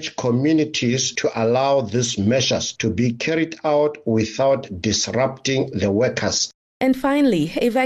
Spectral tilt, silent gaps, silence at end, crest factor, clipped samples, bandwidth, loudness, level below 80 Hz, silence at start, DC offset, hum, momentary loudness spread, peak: -4.5 dB/octave; 6.54-6.80 s; 0 s; 12 dB; under 0.1%; 13 kHz; -20 LUFS; -52 dBFS; 0 s; under 0.1%; none; 4 LU; -8 dBFS